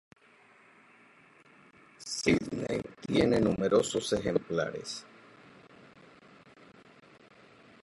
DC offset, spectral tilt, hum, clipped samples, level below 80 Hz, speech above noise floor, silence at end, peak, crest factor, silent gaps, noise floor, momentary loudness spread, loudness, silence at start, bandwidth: under 0.1%; -5 dB/octave; none; under 0.1%; -58 dBFS; 32 dB; 2.8 s; -12 dBFS; 22 dB; none; -61 dBFS; 13 LU; -30 LUFS; 2 s; 11.5 kHz